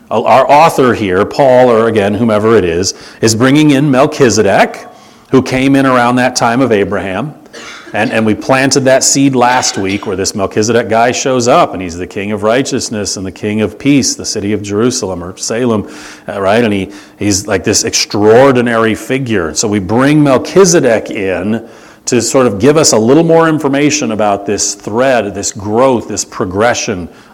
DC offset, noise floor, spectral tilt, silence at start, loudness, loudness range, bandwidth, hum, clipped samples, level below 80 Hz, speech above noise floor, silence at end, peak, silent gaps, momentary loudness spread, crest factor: under 0.1%; -30 dBFS; -4 dB/octave; 0.1 s; -10 LUFS; 4 LU; 19 kHz; none; 1%; -44 dBFS; 20 dB; 0.25 s; 0 dBFS; none; 11 LU; 10 dB